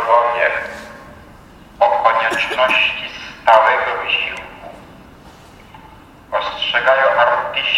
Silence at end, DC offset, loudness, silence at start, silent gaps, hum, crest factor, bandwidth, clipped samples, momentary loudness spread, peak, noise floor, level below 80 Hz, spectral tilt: 0 s; under 0.1%; -15 LUFS; 0 s; none; none; 18 dB; 15 kHz; under 0.1%; 17 LU; 0 dBFS; -41 dBFS; -50 dBFS; -2.5 dB/octave